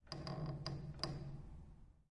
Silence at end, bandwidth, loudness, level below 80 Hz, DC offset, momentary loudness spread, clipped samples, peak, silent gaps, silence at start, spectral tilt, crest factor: 0.05 s; 11 kHz; -47 LUFS; -58 dBFS; under 0.1%; 15 LU; under 0.1%; -22 dBFS; none; 0.05 s; -6 dB/octave; 26 dB